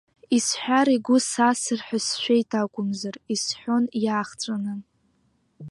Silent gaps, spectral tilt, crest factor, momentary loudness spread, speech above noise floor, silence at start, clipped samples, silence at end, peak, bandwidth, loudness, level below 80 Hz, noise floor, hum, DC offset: none; -3.5 dB/octave; 18 dB; 9 LU; 43 dB; 0.3 s; under 0.1%; 0 s; -6 dBFS; 11.5 kHz; -24 LUFS; -72 dBFS; -67 dBFS; none; under 0.1%